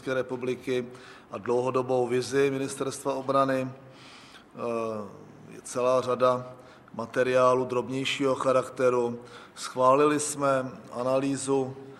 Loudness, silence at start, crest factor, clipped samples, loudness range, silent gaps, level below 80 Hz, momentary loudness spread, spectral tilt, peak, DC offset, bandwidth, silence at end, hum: -27 LUFS; 0.05 s; 18 dB; under 0.1%; 5 LU; none; -70 dBFS; 19 LU; -5 dB/octave; -10 dBFS; under 0.1%; 13.5 kHz; 0 s; none